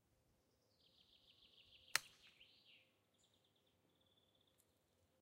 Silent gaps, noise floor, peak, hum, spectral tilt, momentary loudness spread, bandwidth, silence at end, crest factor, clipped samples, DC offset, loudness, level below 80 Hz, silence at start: none; -81 dBFS; -14 dBFS; none; 1.5 dB/octave; 25 LU; 15 kHz; 3.15 s; 44 dB; under 0.1%; under 0.1%; -44 LUFS; under -90 dBFS; 1.95 s